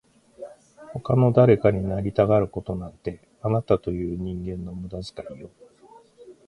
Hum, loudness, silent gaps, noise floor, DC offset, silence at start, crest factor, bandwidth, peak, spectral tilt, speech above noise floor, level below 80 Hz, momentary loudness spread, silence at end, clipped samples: none; -23 LUFS; none; -52 dBFS; under 0.1%; 0.4 s; 20 dB; 10.5 kHz; -4 dBFS; -9.5 dB/octave; 30 dB; -46 dBFS; 22 LU; 0.15 s; under 0.1%